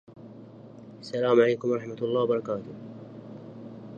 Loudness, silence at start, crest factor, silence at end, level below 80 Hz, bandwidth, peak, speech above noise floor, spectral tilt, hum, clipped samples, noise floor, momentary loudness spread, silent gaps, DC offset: -26 LUFS; 0.1 s; 20 dB; 0 s; -72 dBFS; 7.4 kHz; -8 dBFS; 21 dB; -7 dB/octave; none; under 0.1%; -46 dBFS; 25 LU; none; under 0.1%